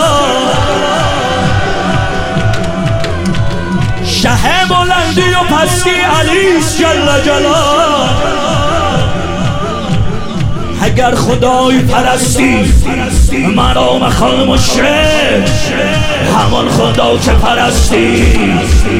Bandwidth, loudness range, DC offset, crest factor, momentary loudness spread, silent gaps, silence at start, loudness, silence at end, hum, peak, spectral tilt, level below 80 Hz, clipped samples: 16.5 kHz; 4 LU; under 0.1%; 10 dB; 6 LU; none; 0 s; -10 LUFS; 0 s; none; 0 dBFS; -4.5 dB/octave; -18 dBFS; under 0.1%